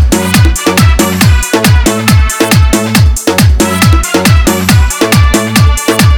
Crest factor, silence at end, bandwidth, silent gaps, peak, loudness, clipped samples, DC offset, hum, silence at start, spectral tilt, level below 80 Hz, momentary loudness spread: 6 dB; 0 s; over 20 kHz; none; 0 dBFS; -8 LUFS; 2%; 0.4%; none; 0 s; -4.5 dB/octave; -12 dBFS; 1 LU